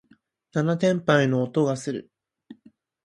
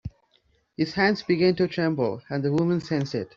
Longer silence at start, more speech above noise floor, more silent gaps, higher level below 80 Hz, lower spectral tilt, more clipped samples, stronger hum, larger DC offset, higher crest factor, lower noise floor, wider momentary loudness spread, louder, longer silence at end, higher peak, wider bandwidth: first, 0.55 s vs 0.05 s; about the same, 39 dB vs 42 dB; neither; second, -68 dBFS vs -56 dBFS; about the same, -6.5 dB/octave vs -7 dB/octave; neither; neither; neither; about the same, 20 dB vs 16 dB; second, -61 dBFS vs -66 dBFS; first, 11 LU vs 7 LU; about the same, -23 LUFS vs -24 LUFS; first, 0.5 s vs 0.1 s; about the same, -6 dBFS vs -8 dBFS; first, 11.5 kHz vs 7.4 kHz